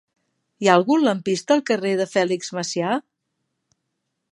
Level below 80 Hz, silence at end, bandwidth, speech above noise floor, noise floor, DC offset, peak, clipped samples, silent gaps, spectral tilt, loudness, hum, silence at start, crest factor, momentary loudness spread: -74 dBFS; 1.3 s; 11.5 kHz; 57 dB; -77 dBFS; under 0.1%; 0 dBFS; under 0.1%; none; -4.5 dB/octave; -21 LUFS; none; 0.6 s; 22 dB; 9 LU